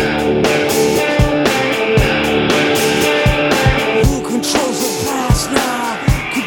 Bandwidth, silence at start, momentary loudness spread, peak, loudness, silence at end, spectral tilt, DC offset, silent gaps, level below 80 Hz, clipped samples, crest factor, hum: over 20 kHz; 0 s; 4 LU; 0 dBFS; -14 LUFS; 0 s; -4.5 dB/octave; under 0.1%; none; -26 dBFS; under 0.1%; 14 dB; none